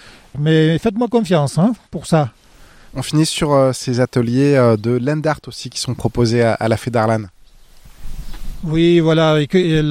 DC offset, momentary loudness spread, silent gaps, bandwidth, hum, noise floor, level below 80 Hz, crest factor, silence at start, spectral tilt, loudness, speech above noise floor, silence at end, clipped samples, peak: under 0.1%; 14 LU; none; 15 kHz; none; -43 dBFS; -36 dBFS; 14 dB; 0.05 s; -6 dB/octave; -16 LUFS; 28 dB; 0 s; under 0.1%; -2 dBFS